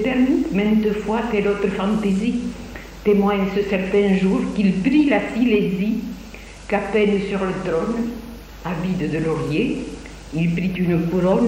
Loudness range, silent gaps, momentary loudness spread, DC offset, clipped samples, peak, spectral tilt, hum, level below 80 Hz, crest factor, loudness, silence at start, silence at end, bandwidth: 5 LU; none; 13 LU; under 0.1%; under 0.1%; -4 dBFS; -7.5 dB/octave; none; -40 dBFS; 16 dB; -20 LUFS; 0 s; 0 s; 15.5 kHz